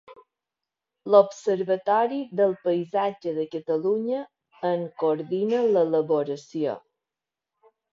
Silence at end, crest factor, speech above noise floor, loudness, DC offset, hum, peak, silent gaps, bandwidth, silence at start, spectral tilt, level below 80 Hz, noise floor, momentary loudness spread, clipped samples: 1.15 s; 22 dB; 65 dB; -25 LUFS; under 0.1%; none; -4 dBFS; none; 7.6 kHz; 0.1 s; -7 dB/octave; -78 dBFS; -89 dBFS; 10 LU; under 0.1%